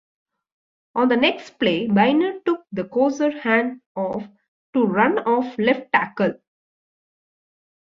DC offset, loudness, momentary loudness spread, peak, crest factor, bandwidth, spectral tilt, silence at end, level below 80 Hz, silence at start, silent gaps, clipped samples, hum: under 0.1%; -21 LUFS; 9 LU; -2 dBFS; 20 dB; 7.4 kHz; -6.5 dB/octave; 1.5 s; -64 dBFS; 0.95 s; 3.86-3.95 s, 4.48-4.73 s; under 0.1%; none